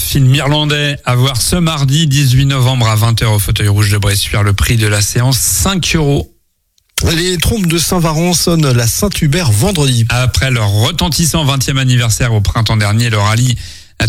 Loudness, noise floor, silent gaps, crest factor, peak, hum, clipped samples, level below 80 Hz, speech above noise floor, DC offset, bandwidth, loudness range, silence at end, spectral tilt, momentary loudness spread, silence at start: -11 LUFS; -59 dBFS; none; 10 dB; 0 dBFS; none; under 0.1%; -26 dBFS; 48 dB; under 0.1%; 16.5 kHz; 2 LU; 0 s; -4.5 dB/octave; 3 LU; 0 s